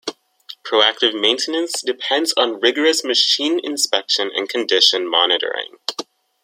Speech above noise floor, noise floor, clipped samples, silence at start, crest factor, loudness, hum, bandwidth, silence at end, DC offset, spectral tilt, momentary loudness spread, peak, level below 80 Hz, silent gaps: 24 dB; -42 dBFS; under 0.1%; 0.05 s; 18 dB; -17 LUFS; none; 16.5 kHz; 0.4 s; under 0.1%; 0 dB/octave; 12 LU; 0 dBFS; -72 dBFS; none